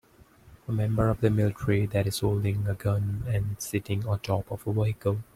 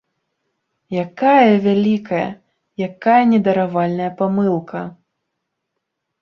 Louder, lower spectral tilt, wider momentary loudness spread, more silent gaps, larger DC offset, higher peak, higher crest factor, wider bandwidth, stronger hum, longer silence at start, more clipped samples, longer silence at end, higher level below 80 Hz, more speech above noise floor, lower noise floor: second, -28 LUFS vs -17 LUFS; second, -7 dB/octave vs -8.5 dB/octave; second, 6 LU vs 14 LU; neither; neither; second, -8 dBFS vs -2 dBFS; about the same, 18 dB vs 16 dB; first, 15.5 kHz vs 6.2 kHz; neither; second, 0.45 s vs 0.9 s; neither; second, 0.1 s vs 1.3 s; first, -48 dBFS vs -62 dBFS; second, 29 dB vs 61 dB; second, -55 dBFS vs -77 dBFS